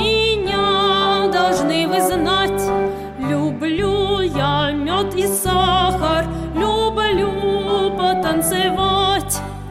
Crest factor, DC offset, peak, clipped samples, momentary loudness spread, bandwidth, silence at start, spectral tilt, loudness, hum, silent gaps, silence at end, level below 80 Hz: 14 dB; 0.2%; -4 dBFS; under 0.1%; 5 LU; 16 kHz; 0 s; -4 dB/octave; -18 LUFS; none; none; 0 s; -34 dBFS